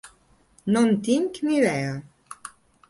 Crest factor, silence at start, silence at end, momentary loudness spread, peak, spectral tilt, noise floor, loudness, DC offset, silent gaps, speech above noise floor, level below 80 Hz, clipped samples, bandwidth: 16 dB; 0.05 s; 0.4 s; 20 LU; -10 dBFS; -6 dB/octave; -59 dBFS; -23 LUFS; under 0.1%; none; 37 dB; -64 dBFS; under 0.1%; 11.5 kHz